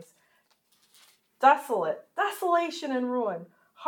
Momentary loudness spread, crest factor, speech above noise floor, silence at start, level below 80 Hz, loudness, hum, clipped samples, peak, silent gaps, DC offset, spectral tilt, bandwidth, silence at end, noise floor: 9 LU; 22 dB; 42 dB; 0 s; under -90 dBFS; -27 LUFS; none; under 0.1%; -6 dBFS; none; under 0.1%; -4 dB/octave; 19 kHz; 0 s; -68 dBFS